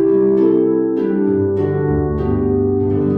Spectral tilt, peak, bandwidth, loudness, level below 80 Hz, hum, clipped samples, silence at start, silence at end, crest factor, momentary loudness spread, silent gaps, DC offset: -12 dB/octave; -4 dBFS; 3.5 kHz; -16 LUFS; -34 dBFS; none; under 0.1%; 0 s; 0 s; 12 dB; 4 LU; none; under 0.1%